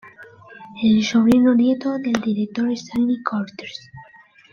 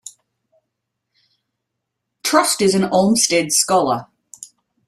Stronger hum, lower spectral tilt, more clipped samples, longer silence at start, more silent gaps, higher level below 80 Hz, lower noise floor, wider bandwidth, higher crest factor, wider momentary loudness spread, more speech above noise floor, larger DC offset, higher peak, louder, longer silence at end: neither; first, -6 dB/octave vs -3 dB/octave; neither; about the same, 0.05 s vs 0.05 s; neither; about the same, -56 dBFS vs -60 dBFS; second, -44 dBFS vs -78 dBFS; second, 7.2 kHz vs 15.5 kHz; about the same, 18 dB vs 20 dB; about the same, 18 LU vs 20 LU; second, 25 dB vs 62 dB; neither; second, -4 dBFS vs 0 dBFS; second, -19 LUFS vs -16 LUFS; about the same, 0.5 s vs 0.4 s